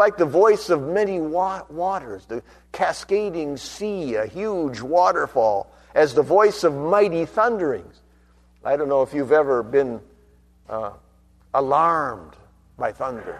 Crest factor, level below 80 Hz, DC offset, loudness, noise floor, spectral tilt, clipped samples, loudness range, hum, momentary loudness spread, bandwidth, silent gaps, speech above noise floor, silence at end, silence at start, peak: 18 dB; -54 dBFS; under 0.1%; -21 LUFS; -55 dBFS; -5.5 dB/octave; under 0.1%; 6 LU; none; 13 LU; 13 kHz; none; 34 dB; 0 s; 0 s; -4 dBFS